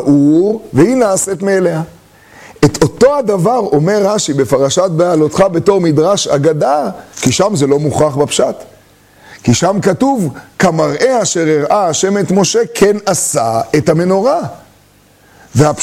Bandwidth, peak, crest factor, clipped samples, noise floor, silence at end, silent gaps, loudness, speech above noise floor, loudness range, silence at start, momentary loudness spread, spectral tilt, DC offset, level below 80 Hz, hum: 16 kHz; 0 dBFS; 12 dB; under 0.1%; -46 dBFS; 0 s; none; -12 LUFS; 35 dB; 2 LU; 0 s; 5 LU; -5 dB/octave; under 0.1%; -44 dBFS; none